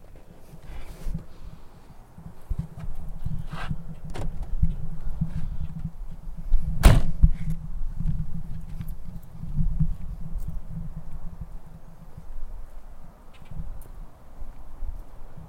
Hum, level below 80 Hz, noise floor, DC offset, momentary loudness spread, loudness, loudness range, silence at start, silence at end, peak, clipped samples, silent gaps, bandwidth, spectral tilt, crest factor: none; -28 dBFS; -45 dBFS; under 0.1%; 22 LU; -31 LUFS; 17 LU; 0 s; 0 s; 0 dBFS; under 0.1%; none; 15.5 kHz; -6.5 dB/octave; 24 dB